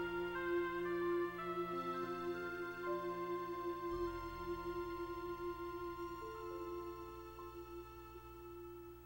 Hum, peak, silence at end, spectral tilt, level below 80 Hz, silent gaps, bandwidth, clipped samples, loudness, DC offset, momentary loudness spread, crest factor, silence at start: none; -30 dBFS; 0 s; -6.5 dB/octave; -62 dBFS; none; 16 kHz; under 0.1%; -44 LUFS; under 0.1%; 13 LU; 14 dB; 0 s